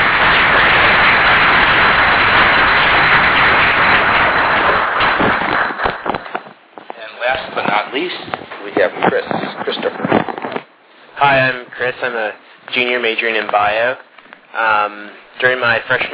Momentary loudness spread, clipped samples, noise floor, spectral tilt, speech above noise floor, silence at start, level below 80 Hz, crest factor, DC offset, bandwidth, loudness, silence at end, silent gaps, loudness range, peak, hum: 14 LU; under 0.1%; -44 dBFS; -7 dB/octave; 28 dB; 0 s; -38 dBFS; 14 dB; under 0.1%; 4 kHz; -12 LUFS; 0 s; none; 10 LU; 0 dBFS; none